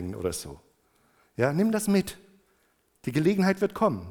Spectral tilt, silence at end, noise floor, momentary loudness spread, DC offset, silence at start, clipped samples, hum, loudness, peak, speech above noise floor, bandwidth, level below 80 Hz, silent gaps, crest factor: -6 dB/octave; 0 s; -68 dBFS; 14 LU; under 0.1%; 0 s; under 0.1%; none; -26 LUFS; -8 dBFS; 43 dB; 18.5 kHz; -58 dBFS; none; 20 dB